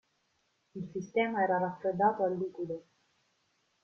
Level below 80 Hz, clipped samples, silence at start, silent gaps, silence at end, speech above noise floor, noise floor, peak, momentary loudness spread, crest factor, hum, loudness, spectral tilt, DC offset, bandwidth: -76 dBFS; under 0.1%; 0.75 s; none; 1.05 s; 44 dB; -76 dBFS; -16 dBFS; 14 LU; 18 dB; none; -32 LUFS; -7 dB/octave; under 0.1%; 6.8 kHz